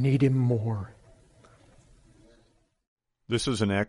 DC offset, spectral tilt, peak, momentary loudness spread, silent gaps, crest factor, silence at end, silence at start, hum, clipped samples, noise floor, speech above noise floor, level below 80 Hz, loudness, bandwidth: under 0.1%; -6.5 dB/octave; -10 dBFS; 12 LU; 2.87-2.97 s; 18 dB; 0 s; 0 s; none; under 0.1%; -66 dBFS; 41 dB; -56 dBFS; -27 LUFS; 11.5 kHz